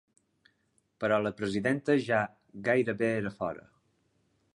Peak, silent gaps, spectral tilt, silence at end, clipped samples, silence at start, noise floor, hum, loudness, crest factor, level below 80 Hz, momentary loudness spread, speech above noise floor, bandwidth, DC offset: -12 dBFS; none; -6.5 dB/octave; 0.95 s; under 0.1%; 1 s; -74 dBFS; none; -30 LUFS; 18 dB; -66 dBFS; 10 LU; 44 dB; 11 kHz; under 0.1%